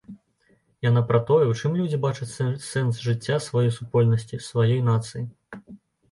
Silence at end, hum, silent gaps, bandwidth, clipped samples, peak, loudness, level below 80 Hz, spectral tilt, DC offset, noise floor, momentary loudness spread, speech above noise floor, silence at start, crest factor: 0.35 s; none; none; 11.5 kHz; under 0.1%; -6 dBFS; -24 LUFS; -58 dBFS; -7 dB/octave; under 0.1%; -64 dBFS; 14 LU; 42 dB; 0.1 s; 18 dB